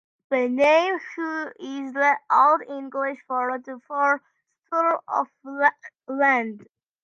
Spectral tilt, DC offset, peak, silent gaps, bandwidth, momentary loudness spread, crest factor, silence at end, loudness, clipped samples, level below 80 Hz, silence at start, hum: -4 dB/octave; under 0.1%; -4 dBFS; none; 7.6 kHz; 14 LU; 20 dB; 0.4 s; -23 LUFS; under 0.1%; -78 dBFS; 0.3 s; none